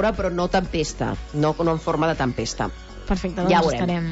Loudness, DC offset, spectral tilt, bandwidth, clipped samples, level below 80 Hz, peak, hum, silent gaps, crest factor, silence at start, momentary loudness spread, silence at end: -23 LUFS; under 0.1%; -5.5 dB/octave; 8 kHz; under 0.1%; -36 dBFS; -8 dBFS; none; none; 16 dB; 0 s; 9 LU; 0 s